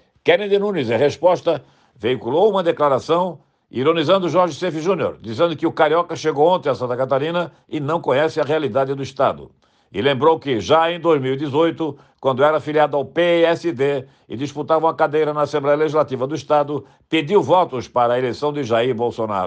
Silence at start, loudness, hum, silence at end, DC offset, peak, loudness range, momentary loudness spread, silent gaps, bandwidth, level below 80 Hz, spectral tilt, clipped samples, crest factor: 0.25 s; -19 LUFS; none; 0 s; under 0.1%; -4 dBFS; 2 LU; 8 LU; none; 8.6 kHz; -62 dBFS; -6 dB/octave; under 0.1%; 16 dB